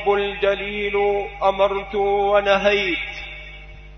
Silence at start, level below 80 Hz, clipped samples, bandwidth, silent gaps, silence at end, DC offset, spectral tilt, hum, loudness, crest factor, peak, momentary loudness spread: 0 s; -42 dBFS; under 0.1%; 6.6 kHz; none; 0 s; under 0.1%; -5 dB/octave; none; -20 LUFS; 18 dB; -4 dBFS; 16 LU